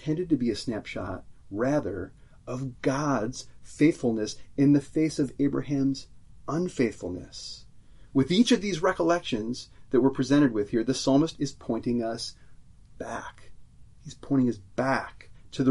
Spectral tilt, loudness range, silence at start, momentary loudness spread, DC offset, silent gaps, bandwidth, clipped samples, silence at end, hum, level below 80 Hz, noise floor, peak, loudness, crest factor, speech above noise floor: -6 dB/octave; 7 LU; 0 s; 17 LU; under 0.1%; none; 11.5 kHz; under 0.1%; 0 s; none; -54 dBFS; -49 dBFS; -10 dBFS; -27 LUFS; 18 dB; 22 dB